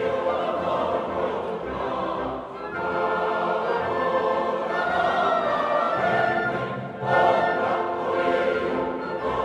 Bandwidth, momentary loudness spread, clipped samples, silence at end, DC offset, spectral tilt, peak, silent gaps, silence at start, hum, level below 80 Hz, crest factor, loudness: 10.5 kHz; 7 LU; under 0.1%; 0 s; under 0.1%; -6.5 dB/octave; -6 dBFS; none; 0 s; none; -54 dBFS; 18 dB; -24 LUFS